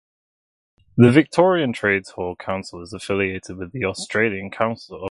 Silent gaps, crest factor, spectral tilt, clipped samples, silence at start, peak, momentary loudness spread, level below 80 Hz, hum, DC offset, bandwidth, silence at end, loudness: none; 20 dB; -6.5 dB/octave; under 0.1%; 0.95 s; 0 dBFS; 17 LU; -50 dBFS; none; under 0.1%; 11.5 kHz; 0 s; -20 LUFS